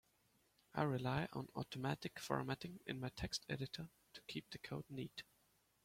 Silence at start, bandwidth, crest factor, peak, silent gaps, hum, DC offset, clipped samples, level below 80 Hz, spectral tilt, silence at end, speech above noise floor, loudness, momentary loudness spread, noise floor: 0.75 s; 16.5 kHz; 22 dB; -24 dBFS; none; none; under 0.1%; under 0.1%; -68 dBFS; -5.5 dB/octave; 0.6 s; 33 dB; -46 LUFS; 10 LU; -78 dBFS